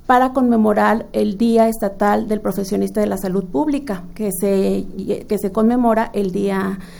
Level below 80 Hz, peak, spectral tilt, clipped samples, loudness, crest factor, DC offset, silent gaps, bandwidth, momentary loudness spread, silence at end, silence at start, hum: -40 dBFS; -2 dBFS; -6.5 dB/octave; under 0.1%; -18 LUFS; 16 dB; under 0.1%; none; over 20 kHz; 8 LU; 0 s; 0.05 s; none